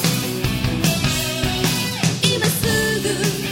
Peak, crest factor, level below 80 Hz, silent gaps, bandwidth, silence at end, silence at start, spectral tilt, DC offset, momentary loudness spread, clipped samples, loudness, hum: -2 dBFS; 18 dB; -36 dBFS; none; 16.5 kHz; 0 s; 0 s; -4 dB/octave; under 0.1%; 4 LU; under 0.1%; -19 LUFS; none